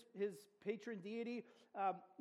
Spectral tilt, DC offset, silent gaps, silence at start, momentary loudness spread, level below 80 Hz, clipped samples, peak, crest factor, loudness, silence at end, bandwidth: -6 dB/octave; under 0.1%; none; 0 s; 8 LU; under -90 dBFS; under 0.1%; -28 dBFS; 18 dB; -47 LUFS; 0.15 s; 13 kHz